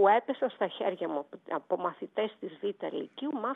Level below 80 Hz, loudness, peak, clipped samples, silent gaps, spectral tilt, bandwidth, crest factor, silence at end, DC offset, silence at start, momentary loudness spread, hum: under -90 dBFS; -33 LUFS; -12 dBFS; under 0.1%; none; -7.5 dB/octave; 4 kHz; 18 dB; 0 s; under 0.1%; 0 s; 7 LU; none